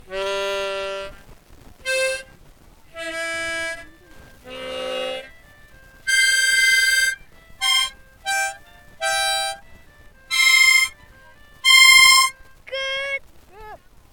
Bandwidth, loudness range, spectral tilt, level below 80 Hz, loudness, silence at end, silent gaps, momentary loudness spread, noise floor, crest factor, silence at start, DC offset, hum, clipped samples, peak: 19 kHz; 14 LU; 1.5 dB/octave; -52 dBFS; -17 LUFS; 0.35 s; none; 20 LU; -48 dBFS; 22 dB; 0.1 s; under 0.1%; none; under 0.1%; 0 dBFS